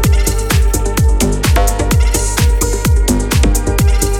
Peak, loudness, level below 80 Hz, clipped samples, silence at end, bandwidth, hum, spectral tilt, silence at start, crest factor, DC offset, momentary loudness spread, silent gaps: 0 dBFS; -13 LUFS; -14 dBFS; under 0.1%; 0 s; 17 kHz; none; -4.5 dB/octave; 0 s; 10 dB; under 0.1%; 1 LU; none